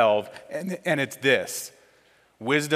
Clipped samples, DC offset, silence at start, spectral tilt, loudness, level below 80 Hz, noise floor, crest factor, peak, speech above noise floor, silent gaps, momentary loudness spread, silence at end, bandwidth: under 0.1%; under 0.1%; 0 s; -4 dB/octave; -26 LUFS; -76 dBFS; -60 dBFS; 20 dB; -6 dBFS; 35 dB; none; 13 LU; 0 s; 16 kHz